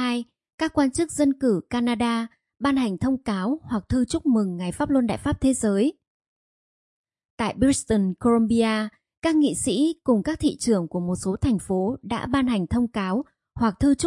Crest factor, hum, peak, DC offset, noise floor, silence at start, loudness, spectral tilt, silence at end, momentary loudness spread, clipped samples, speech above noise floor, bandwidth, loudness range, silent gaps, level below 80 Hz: 16 dB; none; -8 dBFS; under 0.1%; under -90 dBFS; 0 s; -24 LUFS; -5.5 dB/octave; 0 s; 7 LU; under 0.1%; over 68 dB; 11.5 kHz; 3 LU; 0.54-0.58 s, 6.07-6.20 s, 6.27-7.04 s, 7.25-7.38 s, 9.17-9.22 s; -46 dBFS